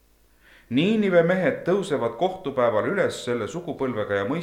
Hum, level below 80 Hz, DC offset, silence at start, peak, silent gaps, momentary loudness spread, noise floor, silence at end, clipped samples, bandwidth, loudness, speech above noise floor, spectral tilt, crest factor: none; -60 dBFS; under 0.1%; 0.7 s; -6 dBFS; none; 9 LU; -57 dBFS; 0 s; under 0.1%; 13 kHz; -24 LUFS; 34 dB; -6 dB/octave; 16 dB